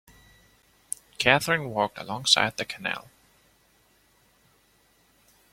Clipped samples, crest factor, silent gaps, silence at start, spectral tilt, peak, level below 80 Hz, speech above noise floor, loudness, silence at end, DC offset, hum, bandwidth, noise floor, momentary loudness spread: under 0.1%; 28 dB; none; 1.2 s; -2.5 dB/octave; -2 dBFS; -62 dBFS; 38 dB; -25 LUFS; 2.5 s; under 0.1%; none; 16.5 kHz; -64 dBFS; 16 LU